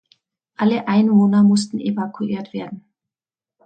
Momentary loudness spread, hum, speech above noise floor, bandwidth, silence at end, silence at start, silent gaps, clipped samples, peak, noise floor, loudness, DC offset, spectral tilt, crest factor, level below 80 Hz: 16 LU; none; over 73 dB; 9 kHz; 0.85 s; 0.6 s; none; under 0.1%; -6 dBFS; under -90 dBFS; -18 LUFS; under 0.1%; -7 dB/octave; 14 dB; -64 dBFS